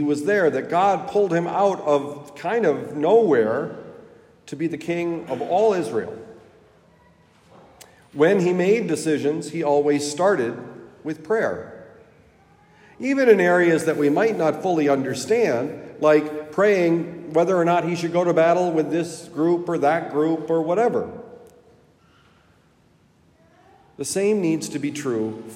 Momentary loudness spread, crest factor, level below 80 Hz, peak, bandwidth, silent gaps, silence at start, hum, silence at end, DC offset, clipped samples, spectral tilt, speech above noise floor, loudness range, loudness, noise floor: 12 LU; 20 dB; -68 dBFS; -2 dBFS; 15.5 kHz; none; 0 s; none; 0 s; under 0.1%; under 0.1%; -6 dB/octave; 38 dB; 7 LU; -21 LUFS; -58 dBFS